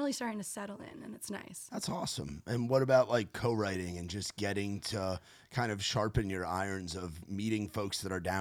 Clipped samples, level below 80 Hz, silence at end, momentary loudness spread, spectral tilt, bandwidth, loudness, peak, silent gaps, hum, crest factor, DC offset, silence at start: under 0.1%; -56 dBFS; 0 s; 11 LU; -5 dB/octave; 18 kHz; -35 LUFS; -16 dBFS; none; none; 20 dB; under 0.1%; 0 s